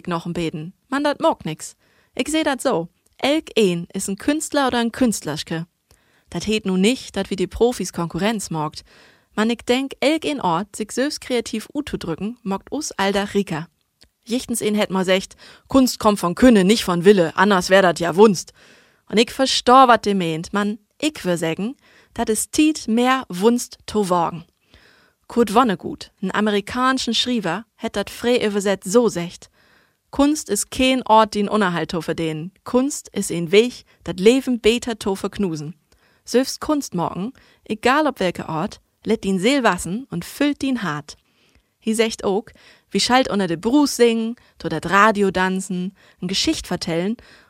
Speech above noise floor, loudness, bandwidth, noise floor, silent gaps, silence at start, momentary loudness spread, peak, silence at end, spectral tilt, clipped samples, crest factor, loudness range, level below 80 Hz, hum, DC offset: 40 dB; -20 LUFS; 16 kHz; -60 dBFS; none; 0.05 s; 13 LU; 0 dBFS; 0.35 s; -4.5 dB/octave; under 0.1%; 20 dB; 7 LU; -50 dBFS; none; under 0.1%